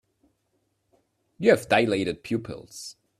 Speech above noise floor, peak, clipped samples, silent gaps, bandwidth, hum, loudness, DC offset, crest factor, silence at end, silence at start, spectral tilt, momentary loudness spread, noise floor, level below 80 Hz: 49 dB; -4 dBFS; under 0.1%; none; 14.5 kHz; none; -24 LUFS; under 0.1%; 22 dB; 0.3 s; 1.4 s; -5 dB/octave; 19 LU; -73 dBFS; -62 dBFS